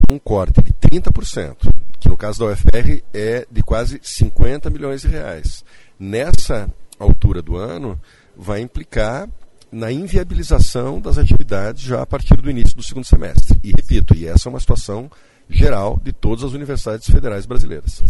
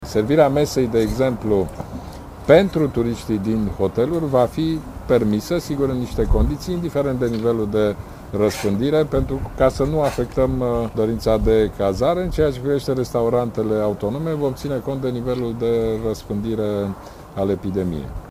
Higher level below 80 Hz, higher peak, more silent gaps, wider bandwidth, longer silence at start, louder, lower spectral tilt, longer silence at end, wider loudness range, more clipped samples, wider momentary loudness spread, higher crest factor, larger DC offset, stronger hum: first, -16 dBFS vs -32 dBFS; about the same, 0 dBFS vs 0 dBFS; neither; second, 11.5 kHz vs 16 kHz; about the same, 0 s vs 0 s; about the same, -19 LUFS vs -20 LUFS; about the same, -6.5 dB/octave vs -7 dB/octave; about the same, 0 s vs 0 s; about the same, 5 LU vs 4 LU; first, 0.4% vs under 0.1%; first, 11 LU vs 8 LU; second, 10 dB vs 20 dB; neither; neither